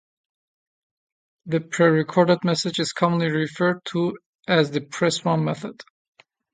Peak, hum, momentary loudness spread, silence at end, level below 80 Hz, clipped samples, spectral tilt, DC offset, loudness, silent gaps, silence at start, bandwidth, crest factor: -4 dBFS; none; 8 LU; 0.7 s; -68 dBFS; under 0.1%; -5.5 dB/octave; under 0.1%; -22 LUFS; 4.26-4.39 s; 1.45 s; 9.4 kHz; 20 dB